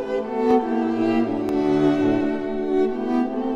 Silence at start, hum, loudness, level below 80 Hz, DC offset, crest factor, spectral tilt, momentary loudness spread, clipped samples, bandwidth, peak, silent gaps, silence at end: 0 s; none; -21 LUFS; -52 dBFS; under 0.1%; 14 dB; -7.5 dB/octave; 4 LU; under 0.1%; 8 kHz; -6 dBFS; none; 0 s